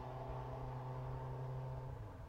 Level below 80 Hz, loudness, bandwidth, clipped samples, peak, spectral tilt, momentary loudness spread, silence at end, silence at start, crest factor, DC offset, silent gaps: -54 dBFS; -47 LUFS; 7 kHz; under 0.1%; -34 dBFS; -8.5 dB/octave; 2 LU; 0 s; 0 s; 12 dB; under 0.1%; none